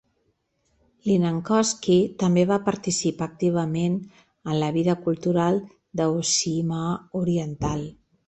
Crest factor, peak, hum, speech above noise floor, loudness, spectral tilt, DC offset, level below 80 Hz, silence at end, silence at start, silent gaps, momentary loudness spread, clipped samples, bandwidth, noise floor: 16 dB; -8 dBFS; none; 48 dB; -24 LUFS; -5.5 dB/octave; under 0.1%; -54 dBFS; 0.35 s; 1.05 s; none; 8 LU; under 0.1%; 8.4 kHz; -71 dBFS